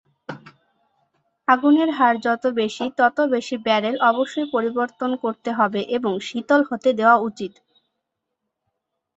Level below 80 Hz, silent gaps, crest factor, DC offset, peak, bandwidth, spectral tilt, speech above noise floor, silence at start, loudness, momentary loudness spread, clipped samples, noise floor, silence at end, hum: -70 dBFS; none; 18 dB; under 0.1%; -2 dBFS; 8 kHz; -5 dB/octave; 60 dB; 0.3 s; -20 LUFS; 12 LU; under 0.1%; -80 dBFS; 1.7 s; none